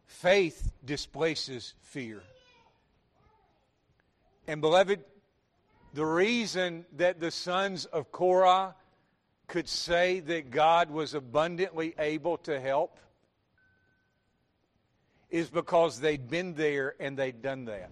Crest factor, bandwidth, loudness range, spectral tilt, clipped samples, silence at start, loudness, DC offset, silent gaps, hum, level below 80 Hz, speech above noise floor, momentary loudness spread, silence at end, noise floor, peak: 20 dB; 12.5 kHz; 9 LU; -4.5 dB/octave; under 0.1%; 0.1 s; -29 LUFS; under 0.1%; none; none; -54 dBFS; 45 dB; 14 LU; 0.05 s; -74 dBFS; -10 dBFS